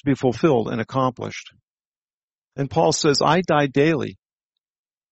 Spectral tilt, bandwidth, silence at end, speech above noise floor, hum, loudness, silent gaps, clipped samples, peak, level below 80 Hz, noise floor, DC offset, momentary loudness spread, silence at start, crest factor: -5 dB/octave; 8.2 kHz; 0.95 s; over 70 dB; none; -20 LUFS; 1.63-1.78 s, 1.85-2.06 s, 2.13-2.28 s, 2.34-2.42 s; under 0.1%; -4 dBFS; -56 dBFS; under -90 dBFS; under 0.1%; 15 LU; 0.05 s; 18 dB